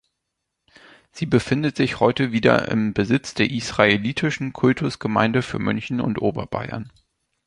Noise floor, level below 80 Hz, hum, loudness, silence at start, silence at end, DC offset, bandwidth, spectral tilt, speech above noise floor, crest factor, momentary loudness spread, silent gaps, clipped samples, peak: -79 dBFS; -50 dBFS; none; -21 LUFS; 1.15 s; 0.6 s; under 0.1%; 11 kHz; -6 dB/octave; 58 dB; 20 dB; 11 LU; none; under 0.1%; -2 dBFS